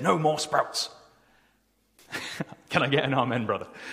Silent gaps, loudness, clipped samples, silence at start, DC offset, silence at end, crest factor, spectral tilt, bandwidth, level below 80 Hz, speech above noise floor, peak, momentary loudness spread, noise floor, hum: none; -27 LUFS; under 0.1%; 0 s; under 0.1%; 0 s; 24 dB; -4.5 dB/octave; 15.5 kHz; -66 dBFS; 42 dB; -4 dBFS; 12 LU; -68 dBFS; none